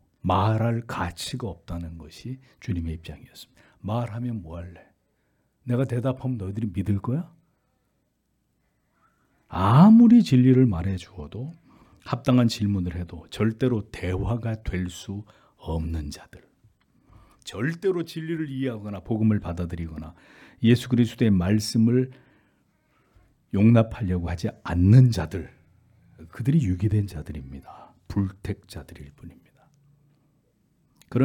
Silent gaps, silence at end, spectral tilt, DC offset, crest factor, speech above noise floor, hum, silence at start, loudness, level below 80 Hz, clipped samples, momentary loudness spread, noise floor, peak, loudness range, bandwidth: none; 0 s; -7.5 dB/octave; under 0.1%; 20 dB; 49 dB; none; 0.25 s; -23 LUFS; -48 dBFS; under 0.1%; 21 LU; -72 dBFS; -4 dBFS; 14 LU; 14.5 kHz